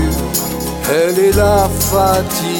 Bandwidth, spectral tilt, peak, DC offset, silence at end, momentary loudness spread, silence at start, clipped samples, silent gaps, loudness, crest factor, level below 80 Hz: 19.5 kHz; -4.5 dB/octave; 0 dBFS; under 0.1%; 0 s; 6 LU; 0 s; under 0.1%; none; -14 LUFS; 14 dB; -26 dBFS